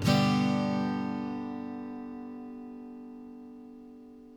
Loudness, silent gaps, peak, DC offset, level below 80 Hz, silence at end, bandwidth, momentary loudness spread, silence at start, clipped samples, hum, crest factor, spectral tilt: -31 LUFS; none; -12 dBFS; under 0.1%; -62 dBFS; 0 s; 17.5 kHz; 22 LU; 0 s; under 0.1%; 60 Hz at -75 dBFS; 20 dB; -6.5 dB/octave